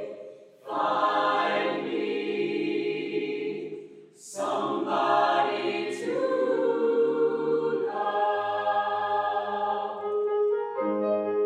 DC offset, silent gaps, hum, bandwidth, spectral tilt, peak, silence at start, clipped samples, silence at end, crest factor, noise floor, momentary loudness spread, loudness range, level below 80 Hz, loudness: under 0.1%; none; none; 11.5 kHz; -4.5 dB/octave; -12 dBFS; 0 s; under 0.1%; 0 s; 16 dB; -47 dBFS; 9 LU; 4 LU; -88 dBFS; -27 LUFS